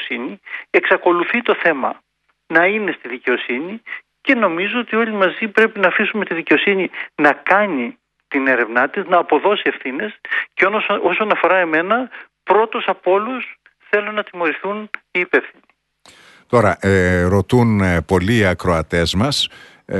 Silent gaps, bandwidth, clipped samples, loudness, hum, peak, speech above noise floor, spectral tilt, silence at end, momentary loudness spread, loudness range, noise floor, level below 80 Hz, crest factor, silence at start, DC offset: none; 12 kHz; under 0.1%; -17 LUFS; none; 0 dBFS; 33 dB; -5.5 dB/octave; 0 s; 10 LU; 4 LU; -50 dBFS; -46 dBFS; 18 dB; 0 s; under 0.1%